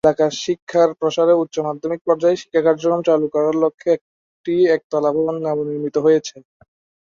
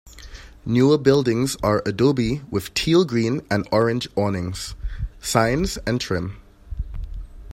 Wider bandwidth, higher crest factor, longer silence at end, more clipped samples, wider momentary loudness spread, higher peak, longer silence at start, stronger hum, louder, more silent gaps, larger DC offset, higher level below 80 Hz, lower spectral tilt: second, 7.4 kHz vs 16 kHz; about the same, 16 dB vs 18 dB; first, 0.75 s vs 0 s; neither; second, 7 LU vs 18 LU; about the same, -2 dBFS vs -2 dBFS; about the same, 0.05 s vs 0.05 s; neither; first, -18 LUFS vs -21 LUFS; first, 0.62-0.67 s, 2.01-2.05 s, 3.74-3.78 s, 4.01-4.44 s, 4.84-4.90 s vs none; neither; second, -62 dBFS vs -36 dBFS; about the same, -5.5 dB/octave vs -5.5 dB/octave